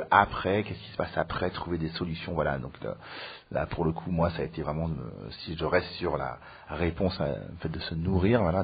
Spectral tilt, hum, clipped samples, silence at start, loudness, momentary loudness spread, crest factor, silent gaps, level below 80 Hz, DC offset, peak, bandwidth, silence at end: -5 dB/octave; none; under 0.1%; 0 s; -30 LUFS; 13 LU; 24 dB; none; -46 dBFS; under 0.1%; -4 dBFS; 5 kHz; 0 s